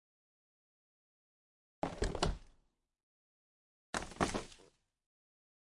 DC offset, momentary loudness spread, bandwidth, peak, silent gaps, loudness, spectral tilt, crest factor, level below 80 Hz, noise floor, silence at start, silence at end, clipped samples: under 0.1%; 10 LU; 11.5 kHz; -16 dBFS; 3.03-3.93 s; -40 LUFS; -4.5 dB/octave; 28 dB; -52 dBFS; -75 dBFS; 1.85 s; 1.2 s; under 0.1%